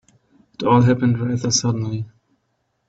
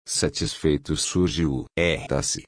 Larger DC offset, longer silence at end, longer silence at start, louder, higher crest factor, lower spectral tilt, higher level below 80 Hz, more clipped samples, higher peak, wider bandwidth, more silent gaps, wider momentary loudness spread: neither; first, 0.8 s vs 0.05 s; first, 0.6 s vs 0.05 s; first, -19 LUFS vs -24 LUFS; about the same, 18 dB vs 16 dB; first, -5.5 dB/octave vs -4 dB/octave; second, -54 dBFS vs -40 dBFS; neither; first, -2 dBFS vs -8 dBFS; second, 7.8 kHz vs 10.5 kHz; neither; first, 13 LU vs 3 LU